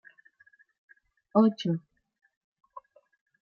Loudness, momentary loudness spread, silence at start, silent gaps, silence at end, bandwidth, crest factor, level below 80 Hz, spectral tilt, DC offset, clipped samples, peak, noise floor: -27 LUFS; 27 LU; 1.35 s; 2.37-2.56 s; 0.65 s; 6.8 kHz; 24 dB; -82 dBFS; -8 dB/octave; under 0.1%; under 0.1%; -8 dBFS; -63 dBFS